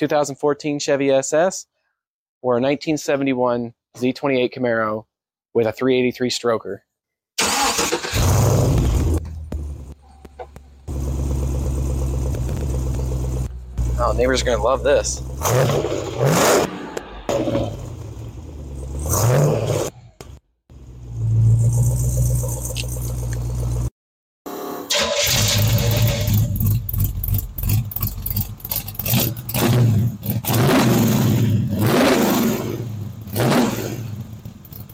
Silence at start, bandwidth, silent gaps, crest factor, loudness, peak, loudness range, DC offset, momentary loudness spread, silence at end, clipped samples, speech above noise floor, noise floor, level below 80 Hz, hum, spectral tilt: 0 s; 17 kHz; 2.07-2.41 s, 23.91-24.45 s; 14 dB; -20 LUFS; -6 dBFS; 5 LU; under 0.1%; 15 LU; 0 s; under 0.1%; 64 dB; -82 dBFS; -30 dBFS; none; -5 dB/octave